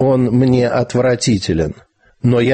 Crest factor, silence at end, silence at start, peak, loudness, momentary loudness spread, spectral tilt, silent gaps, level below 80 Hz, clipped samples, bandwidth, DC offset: 12 dB; 0 s; 0 s; -2 dBFS; -15 LUFS; 7 LU; -6.5 dB/octave; none; -38 dBFS; under 0.1%; 8.8 kHz; under 0.1%